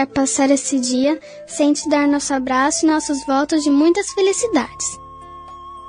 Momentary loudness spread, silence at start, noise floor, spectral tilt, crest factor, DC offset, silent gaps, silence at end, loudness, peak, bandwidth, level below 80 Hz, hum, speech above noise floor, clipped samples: 17 LU; 0 s; -37 dBFS; -2.5 dB/octave; 14 dB; under 0.1%; none; 0 s; -17 LUFS; -4 dBFS; 10 kHz; -52 dBFS; none; 19 dB; under 0.1%